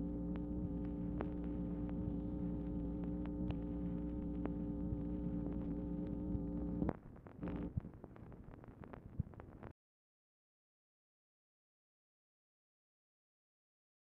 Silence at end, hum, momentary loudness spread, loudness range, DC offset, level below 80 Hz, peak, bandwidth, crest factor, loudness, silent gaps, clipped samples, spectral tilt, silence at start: 4.4 s; none; 13 LU; 13 LU; under 0.1%; -52 dBFS; -20 dBFS; 3.9 kHz; 24 dB; -43 LUFS; none; under 0.1%; -10.5 dB/octave; 0 s